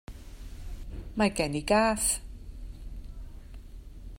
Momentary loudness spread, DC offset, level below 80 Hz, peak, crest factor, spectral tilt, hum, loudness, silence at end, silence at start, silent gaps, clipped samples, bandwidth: 24 LU; under 0.1%; -42 dBFS; -10 dBFS; 22 dB; -3.5 dB/octave; none; -27 LUFS; 0 s; 0.1 s; none; under 0.1%; 16 kHz